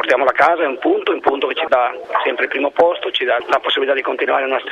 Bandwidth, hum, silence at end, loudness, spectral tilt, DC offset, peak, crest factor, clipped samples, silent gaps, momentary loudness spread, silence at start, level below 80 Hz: 10 kHz; none; 0 s; -16 LUFS; -3.5 dB/octave; under 0.1%; 0 dBFS; 16 dB; under 0.1%; none; 4 LU; 0 s; -60 dBFS